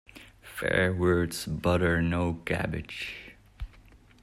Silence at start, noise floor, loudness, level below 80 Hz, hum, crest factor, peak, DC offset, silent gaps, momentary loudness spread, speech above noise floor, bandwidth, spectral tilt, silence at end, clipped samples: 0.15 s; -55 dBFS; -28 LUFS; -48 dBFS; none; 18 dB; -12 dBFS; under 0.1%; none; 21 LU; 27 dB; 16 kHz; -6 dB/octave; 0.55 s; under 0.1%